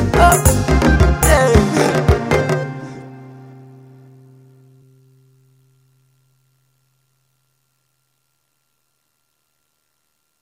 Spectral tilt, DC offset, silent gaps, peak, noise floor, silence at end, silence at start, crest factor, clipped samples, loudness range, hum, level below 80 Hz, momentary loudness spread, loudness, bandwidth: -5.5 dB/octave; under 0.1%; none; 0 dBFS; -69 dBFS; 7.15 s; 0 s; 18 dB; under 0.1%; 22 LU; none; -24 dBFS; 23 LU; -14 LUFS; 16.5 kHz